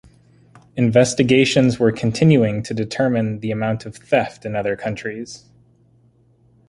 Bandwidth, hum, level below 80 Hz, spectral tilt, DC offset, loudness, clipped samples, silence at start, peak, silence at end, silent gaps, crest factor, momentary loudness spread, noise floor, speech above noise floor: 11.5 kHz; none; -52 dBFS; -6 dB/octave; under 0.1%; -18 LUFS; under 0.1%; 0.75 s; -2 dBFS; 1.3 s; none; 18 dB; 14 LU; -55 dBFS; 38 dB